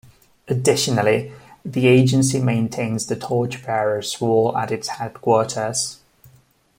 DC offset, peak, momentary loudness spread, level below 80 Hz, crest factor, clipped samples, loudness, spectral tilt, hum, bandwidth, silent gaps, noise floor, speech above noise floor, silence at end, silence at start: under 0.1%; -2 dBFS; 10 LU; -56 dBFS; 18 dB; under 0.1%; -20 LUFS; -5 dB/octave; none; 16.5 kHz; none; -55 dBFS; 36 dB; 0.85 s; 0.45 s